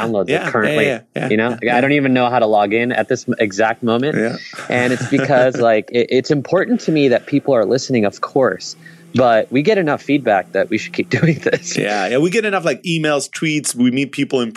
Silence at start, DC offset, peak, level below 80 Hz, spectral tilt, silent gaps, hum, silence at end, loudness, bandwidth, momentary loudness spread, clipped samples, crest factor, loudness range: 0 s; under 0.1%; -2 dBFS; -62 dBFS; -5 dB/octave; none; none; 0 s; -16 LUFS; 13 kHz; 5 LU; under 0.1%; 14 dB; 2 LU